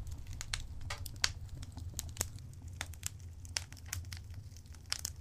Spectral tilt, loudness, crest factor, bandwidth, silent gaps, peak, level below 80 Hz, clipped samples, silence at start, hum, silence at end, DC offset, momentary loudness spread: -2 dB/octave; -42 LUFS; 36 dB; 15.5 kHz; none; -6 dBFS; -50 dBFS; under 0.1%; 0 s; none; 0 s; under 0.1%; 14 LU